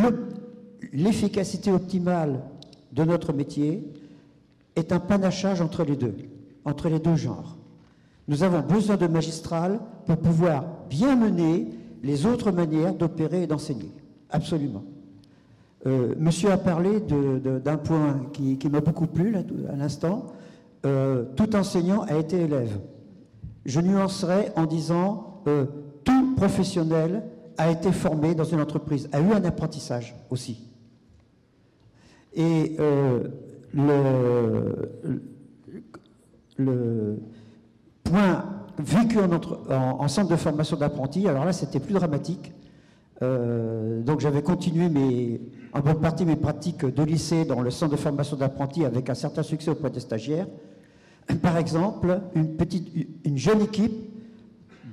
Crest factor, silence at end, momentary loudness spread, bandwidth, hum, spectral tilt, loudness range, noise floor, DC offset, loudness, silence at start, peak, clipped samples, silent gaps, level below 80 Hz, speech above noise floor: 10 dB; 0 s; 12 LU; 12.5 kHz; none; -7.5 dB/octave; 4 LU; -60 dBFS; under 0.1%; -25 LUFS; 0 s; -14 dBFS; under 0.1%; none; -54 dBFS; 36 dB